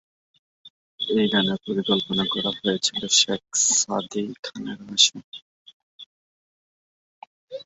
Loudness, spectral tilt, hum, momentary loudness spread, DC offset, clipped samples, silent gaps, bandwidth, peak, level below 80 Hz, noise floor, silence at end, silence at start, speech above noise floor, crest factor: -21 LUFS; -2 dB/octave; none; 16 LU; under 0.1%; under 0.1%; 0.70-0.98 s, 4.39-4.43 s, 5.24-5.32 s, 5.42-5.66 s, 5.73-5.99 s, 6.06-7.48 s; 8.2 kHz; -4 dBFS; -64 dBFS; under -90 dBFS; 0.05 s; 0.65 s; over 66 dB; 22 dB